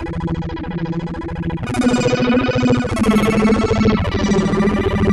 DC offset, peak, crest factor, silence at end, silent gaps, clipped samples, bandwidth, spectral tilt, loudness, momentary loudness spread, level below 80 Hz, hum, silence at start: under 0.1%; -4 dBFS; 12 dB; 0 s; none; under 0.1%; 12.5 kHz; -6.5 dB/octave; -17 LUFS; 9 LU; -30 dBFS; none; 0 s